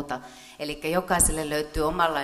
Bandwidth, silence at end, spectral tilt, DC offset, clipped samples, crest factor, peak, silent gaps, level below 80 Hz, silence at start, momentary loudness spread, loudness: 15.5 kHz; 0 s; -3 dB/octave; under 0.1%; under 0.1%; 18 dB; -8 dBFS; none; -38 dBFS; 0 s; 14 LU; -25 LUFS